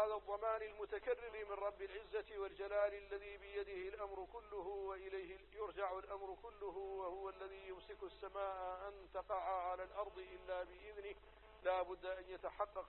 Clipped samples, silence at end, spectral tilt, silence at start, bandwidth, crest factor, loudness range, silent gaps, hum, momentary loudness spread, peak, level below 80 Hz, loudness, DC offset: under 0.1%; 0 s; -2.5 dB/octave; 0 s; 4.2 kHz; 20 dB; 4 LU; none; none; 11 LU; -26 dBFS; -68 dBFS; -47 LUFS; under 0.1%